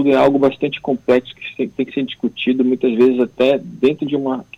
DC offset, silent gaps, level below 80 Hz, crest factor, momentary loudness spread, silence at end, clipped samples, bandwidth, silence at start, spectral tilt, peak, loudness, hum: under 0.1%; none; -56 dBFS; 12 dB; 8 LU; 0.15 s; under 0.1%; 7.4 kHz; 0 s; -7 dB/octave; -4 dBFS; -17 LUFS; none